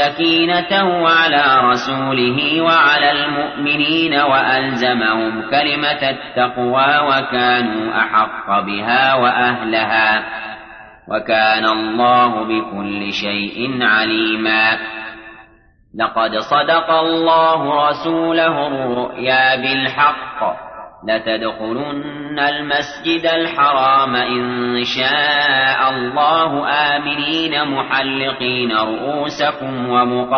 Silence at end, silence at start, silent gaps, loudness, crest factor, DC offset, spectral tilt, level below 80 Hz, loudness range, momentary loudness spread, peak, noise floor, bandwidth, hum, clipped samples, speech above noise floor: 0 s; 0 s; none; -15 LUFS; 14 dB; under 0.1%; -5 dB/octave; -54 dBFS; 4 LU; 8 LU; -2 dBFS; -50 dBFS; 6.6 kHz; none; under 0.1%; 34 dB